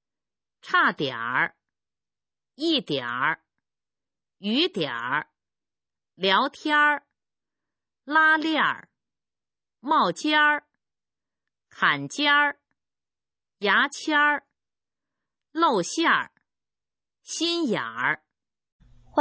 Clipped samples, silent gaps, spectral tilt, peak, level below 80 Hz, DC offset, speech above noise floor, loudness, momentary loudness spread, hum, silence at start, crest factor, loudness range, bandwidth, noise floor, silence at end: under 0.1%; 18.72-18.79 s; -3 dB/octave; -6 dBFS; -74 dBFS; under 0.1%; over 67 dB; -23 LUFS; 10 LU; none; 0.65 s; 20 dB; 5 LU; 8 kHz; under -90 dBFS; 0 s